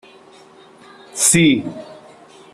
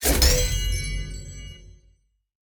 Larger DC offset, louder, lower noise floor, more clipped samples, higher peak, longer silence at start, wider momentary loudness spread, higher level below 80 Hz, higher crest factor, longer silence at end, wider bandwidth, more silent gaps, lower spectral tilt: neither; first, -14 LUFS vs -23 LUFS; second, -45 dBFS vs -63 dBFS; neither; first, -2 dBFS vs -6 dBFS; first, 1.15 s vs 0 s; about the same, 21 LU vs 22 LU; second, -56 dBFS vs -28 dBFS; about the same, 20 dB vs 20 dB; second, 0.6 s vs 0.8 s; second, 14 kHz vs over 20 kHz; neither; about the same, -3 dB/octave vs -3 dB/octave